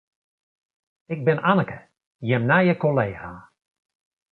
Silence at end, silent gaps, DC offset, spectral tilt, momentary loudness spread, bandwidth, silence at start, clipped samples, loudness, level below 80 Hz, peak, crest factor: 0.9 s; 2.07-2.19 s; under 0.1%; -10 dB/octave; 18 LU; 4.4 kHz; 1.1 s; under 0.1%; -21 LUFS; -58 dBFS; -4 dBFS; 20 dB